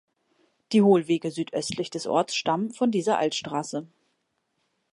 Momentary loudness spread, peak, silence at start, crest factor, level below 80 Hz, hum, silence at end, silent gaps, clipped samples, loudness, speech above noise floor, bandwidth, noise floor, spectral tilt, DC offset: 11 LU; -8 dBFS; 0.7 s; 18 dB; -70 dBFS; none; 1.05 s; none; under 0.1%; -25 LUFS; 51 dB; 11.5 kHz; -75 dBFS; -5 dB/octave; under 0.1%